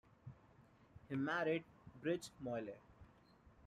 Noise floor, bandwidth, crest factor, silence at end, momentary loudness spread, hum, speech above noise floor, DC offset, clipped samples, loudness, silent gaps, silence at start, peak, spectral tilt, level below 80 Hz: -68 dBFS; 13.5 kHz; 18 dB; 0 s; 21 LU; none; 26 dB; under 0.1%; under 0.1%; -43 LUFS; none; 0.25 s; -28 dBFS; -6 dB/octave; -74 dBFS